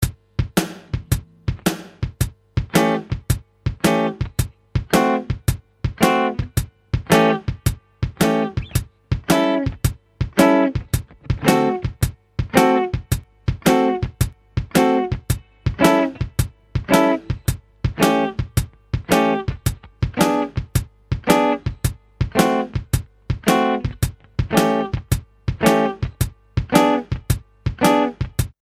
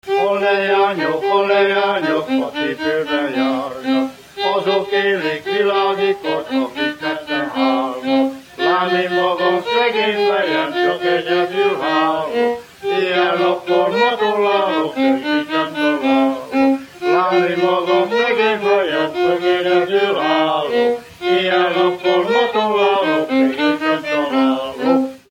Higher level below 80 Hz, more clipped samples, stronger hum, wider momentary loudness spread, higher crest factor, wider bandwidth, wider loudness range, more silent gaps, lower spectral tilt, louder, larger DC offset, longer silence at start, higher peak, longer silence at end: first, -32 dBFS vs -62 dBFS; neither; neither; first, 11 LU vs 5 LU; first, 20 dB vs 14 dB; about the same, 16.5 kHz vs 16 kHz; about the same, 2 LU vs 3 LU; neither; about the same, -5.5 dB/octave vs -5 dB/octave; second, -21 LUFS vs -17 LUFS; neither; about the same, 0 s vs 0.05 s; about the same, 0 dBFS vs -2 dBFS; about the same, 0.15 s vs 0.15 s